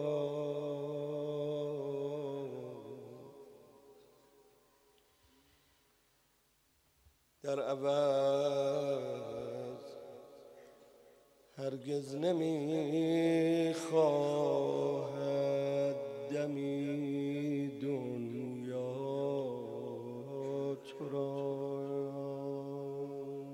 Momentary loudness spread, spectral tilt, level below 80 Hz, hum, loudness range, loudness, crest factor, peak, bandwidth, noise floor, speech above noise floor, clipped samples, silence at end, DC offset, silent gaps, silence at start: 15 LU; -7 dB/octave; -82 dBFS; none; 12 LU; -36 LUFS; 18 dB; -18 dBFS; 15.5 kHz; -73 dBFS; 41 dB; under 0.1%; 0 s; under 0.1%; none; 0 s